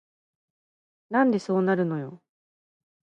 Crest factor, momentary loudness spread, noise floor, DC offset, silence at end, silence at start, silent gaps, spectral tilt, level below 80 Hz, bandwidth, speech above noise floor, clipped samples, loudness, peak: 18 dB; 10 LU; under -90 dBFS; under 0.1%; 0.9 s; 1.1 s; none; -8 dB/octave; -76 dBFS; 9 kHz; over 66 dB; under 0.1%; -25 LUFS; -10 dBFS